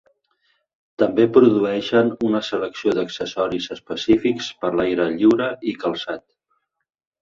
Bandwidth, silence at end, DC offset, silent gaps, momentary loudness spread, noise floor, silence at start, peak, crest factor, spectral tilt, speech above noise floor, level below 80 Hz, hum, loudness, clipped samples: 7.4 kHz; 1 s; under 0.1%; none; 11 LU; -71 dBFS; 1 s; -2 dBFS; 18 dB; -6 dB/octave; 52 dB; -56 dBFS; none; -20 LUFS; under 0.1%